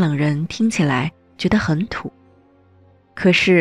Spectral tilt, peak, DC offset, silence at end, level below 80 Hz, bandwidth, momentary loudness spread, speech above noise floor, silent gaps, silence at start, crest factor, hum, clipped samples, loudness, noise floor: -6 dB/octave; -4 dBFS; under 0.1%; 0 s; -46 dBFS; 11.5 kHz; 13 LU; 35 dB; none; 0 s; 16 dB; none; under 0.1%; -19 LUFS; -52 dBFS